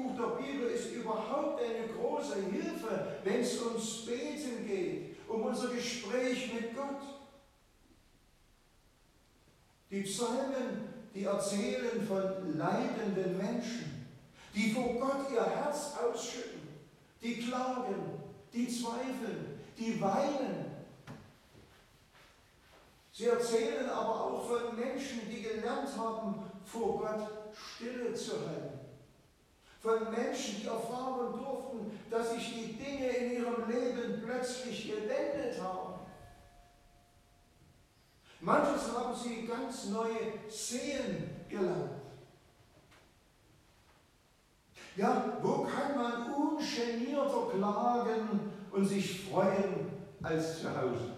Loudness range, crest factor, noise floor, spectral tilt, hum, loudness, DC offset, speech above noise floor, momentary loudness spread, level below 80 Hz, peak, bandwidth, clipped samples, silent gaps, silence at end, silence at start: 7 LU; 22 dB; -68 dBFS; -5 dB/octave; none; -36 LUFS; under 0.1%; 32 dB; 11 LU; -70 dBFS; -14 dBFS; 15 kHz; under 0.1%; none; 0 s; 0 s